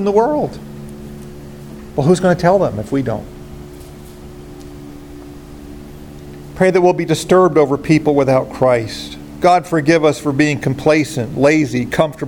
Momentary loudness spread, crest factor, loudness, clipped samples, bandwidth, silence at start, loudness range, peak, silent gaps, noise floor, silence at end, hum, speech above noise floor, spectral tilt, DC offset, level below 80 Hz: 22 LU; 16 dB; -15 LUFS; under 0.1%; 17 kHz; 0 s; 13 LU; 0 dBFS; none; -34 dBFS; 0 s; none; 20 dB; -6.5 dB/octave; under 0.1%; -40 dBFS